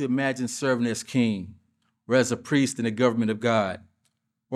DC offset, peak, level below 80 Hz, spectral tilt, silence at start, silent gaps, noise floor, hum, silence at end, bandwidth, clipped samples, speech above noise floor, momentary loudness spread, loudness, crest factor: under 0.1%; -8 dBFS; -68 dBFS; -5 dB/octave; 0 s; none; -74 dBFS; none; 0 s; 13.5 kHz; under 0.1%; 50 dB; 6 LU; -25 LUFS; 18 dB